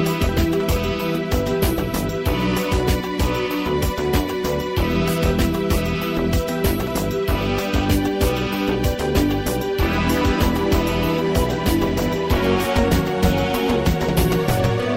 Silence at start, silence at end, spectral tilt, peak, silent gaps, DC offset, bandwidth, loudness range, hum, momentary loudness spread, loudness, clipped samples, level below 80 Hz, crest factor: 0 s; 0 s; -6 dB/octave; -4 dBFS; none; under 0.1%; 16.5 kHz; 2 LU; none; 3 LU; -20 LUFS; under 0.1%; -28 dBFS; 14 dB